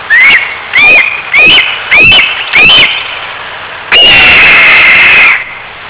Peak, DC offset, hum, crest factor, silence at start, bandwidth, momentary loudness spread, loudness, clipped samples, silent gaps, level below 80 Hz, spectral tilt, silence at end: 0 dBFS; under 0.1%; none; 4 dB; 0 s; 4 kHz; 17 LU; -1 LUFS; under 0.1%; none; -34 dBFS; -4.5 dB/octave; 0 s